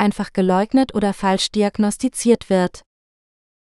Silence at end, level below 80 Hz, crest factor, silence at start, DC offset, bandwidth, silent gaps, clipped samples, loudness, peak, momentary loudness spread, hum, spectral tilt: 0.95 s; -48 dBFS; 18 dB; 0 s; under 0.1%; 12.5 kHz; none; under 0.1%; -19 LUFS; -2 dBFS; 3 LU; none; -5 dB/octave